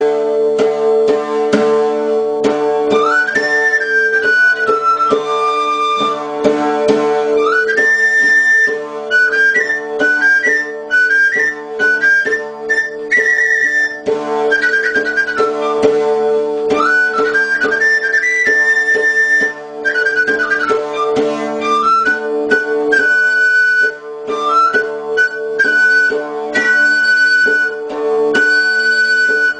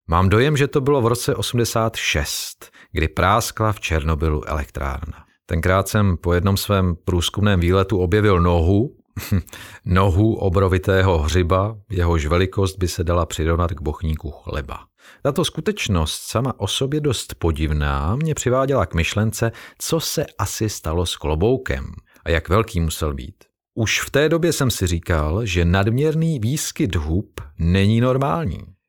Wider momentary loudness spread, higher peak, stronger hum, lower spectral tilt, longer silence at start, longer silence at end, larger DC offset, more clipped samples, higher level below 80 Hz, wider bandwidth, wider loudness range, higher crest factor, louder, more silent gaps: second, 6 LU vs 10 LU; about the same, 0 dBFS vs -2 dBFS; neither; second, -3 dB/octave vs -5.5 dB/octave; about the same, 0 s vs 0.1 s; second, 0 s vs 0.15 s; neither; neither; second, -58 dBFS vs -32 dBFS; second, 10 kHz vs 19 kHz; about the same, 2 LU vs 4 LU; second, 12 dB vs 18 dB; first, -12 LUFS vs -20 LUFS; neither